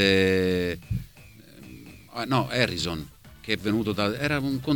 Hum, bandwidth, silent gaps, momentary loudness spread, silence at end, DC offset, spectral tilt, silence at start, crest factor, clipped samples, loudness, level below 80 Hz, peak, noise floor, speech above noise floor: none; 19 kHz; none; 22 LU; 0 s; under 0.1%; -5.5 dB/octave; 0 s; 22 dB; under 0.1%; -26 LUFS; -48 dBFS; -6 dBFS; -50 dBFS; 25 dB